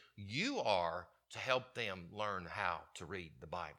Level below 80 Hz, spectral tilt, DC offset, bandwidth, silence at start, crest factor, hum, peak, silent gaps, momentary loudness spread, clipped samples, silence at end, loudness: -70 dBFS; -4 dB/octave; under 0.1%; 14.5 kHz; 0 s; 24 dB; none; -16 dBFS; none; 12 LU; under 0.1%; 0 s; -40 LUFS